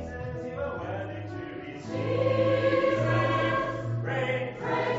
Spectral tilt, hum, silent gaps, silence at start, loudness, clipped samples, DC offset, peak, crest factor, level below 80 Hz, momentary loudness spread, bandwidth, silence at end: -5.5 dB/octave; none; none; 0 s; -28 LUFS; under 0.1%; under 0.1%; -14 dBFS; 14 dB; -52 dBFS; 12 LU; 7.8 kHz; 0 s